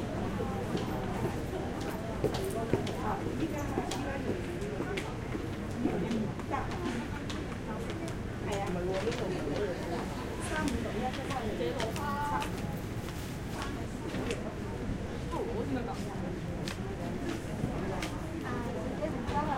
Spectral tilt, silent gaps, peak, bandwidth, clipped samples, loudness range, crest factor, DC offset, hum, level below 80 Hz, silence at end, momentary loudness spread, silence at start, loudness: -6 dB/octave; none; -12 dBFS; 16.5 kHz; under 0.1%; 2 LU; 24 dB; under 0.1%; none; -46 dBFS; 0 s; 5 LU; 0 s; -35 LUFS